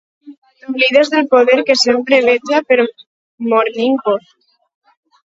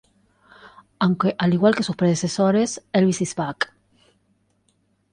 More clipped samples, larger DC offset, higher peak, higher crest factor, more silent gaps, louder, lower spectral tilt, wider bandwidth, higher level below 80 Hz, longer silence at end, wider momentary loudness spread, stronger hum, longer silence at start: neither; neither; first, 0 dBFS vs -4 dBFS; about the same, 14 dB vs 18 dB; first, 0.38-0.42 s, 3.07-3.38 s vs none; first, -13 LUFS vs -21 LUFS; second, -3 dB/octave vs -5.5 dB/octave; second, 7.8 kHz vs 10 kHz; about the same, -62 dBFS vs -62 dBFS; second, 1.15 s vs 1.5 s; about the same, 9 LU vs 7 LU; neither; second, 0.25 s vs 0.65 s